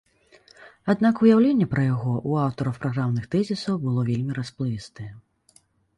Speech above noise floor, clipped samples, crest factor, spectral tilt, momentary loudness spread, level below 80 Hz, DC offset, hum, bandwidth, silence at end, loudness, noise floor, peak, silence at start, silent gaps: 38 dB; under 0.1%; 18 dB; -8 dB/octave; 14 LU; -56 dBFS; under 0.1%; none; 11 kHz; 0.8 s; -23 LUFS; -60 dBFS; -6 dBFS; 0.6 s; none